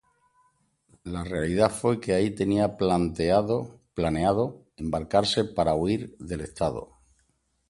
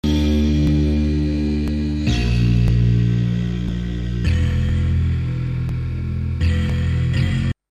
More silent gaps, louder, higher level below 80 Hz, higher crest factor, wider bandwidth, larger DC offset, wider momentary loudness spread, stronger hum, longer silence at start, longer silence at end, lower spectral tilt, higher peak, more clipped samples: neither; second, -26 LUFS vs -20 LUFS; second, -46 dBFS vs -24 dBFS; first, 20 dB vs 12 dB; first, 11.5 kHz vs 8.8 kHz; neither; first, 12 LU vs 7 LU; neither; first, 1.05 s vs 0.05 s; first, 0.85 s vs 0.2 s; second, -6 dB/octave vs -7.5 dB/octave; about the same, -6 dBFS vs -6 dBFS; neither